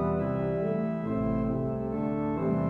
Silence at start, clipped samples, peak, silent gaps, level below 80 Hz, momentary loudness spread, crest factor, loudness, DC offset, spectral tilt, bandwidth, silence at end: 0 s; under 0.1%; -18 dBFS; none; -46 dBFS; 2 LU; 12 dB; -30 LUFS; under 0.1%; -11 dB/octave; 4.2 kHz; 0 s